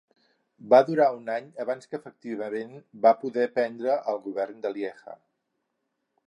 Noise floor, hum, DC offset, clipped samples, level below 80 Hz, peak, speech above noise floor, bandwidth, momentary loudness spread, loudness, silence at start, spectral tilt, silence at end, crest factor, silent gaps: -79 dBFS; none; under 0.1%; under 0.1%; -86 dBFS; -6 dBFS; 53 dB; 10 kHz; 17 LU; -26 LUFS; 0.65 s; -6.5 dB/octave; 1.15 s; 22 dB; none